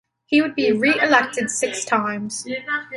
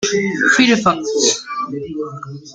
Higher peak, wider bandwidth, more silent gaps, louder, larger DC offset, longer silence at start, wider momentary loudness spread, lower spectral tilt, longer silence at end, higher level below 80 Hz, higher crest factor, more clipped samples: about the same, -2 dBFS vs -2 dBFS; first, 11.5 kHz vs 9.6 kHz; neither; second, -20 LUFS vs -15 LUFS; neither; first, 0.3 s vs 0 s; second, 10 LU vs 15 LU; about the same, -3 dB/octave vs -2.5 dB/octave; about the same, 0 s vs 0 s; second, -66 dBFS vs -56 dBFS; about the same, 18 dB vs 16 dB; neither